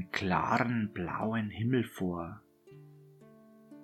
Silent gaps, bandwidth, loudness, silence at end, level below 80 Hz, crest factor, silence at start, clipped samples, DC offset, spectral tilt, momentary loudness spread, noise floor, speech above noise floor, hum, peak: none; 13.5 kHz; -33 LUFS; 0 s; -62 dBFS; 22 dB; 0 s; under 0.1%; under 0.1%; -7 dB/octave; 10 LU; -57 dBFS; 25 dB; none; -12 dBFS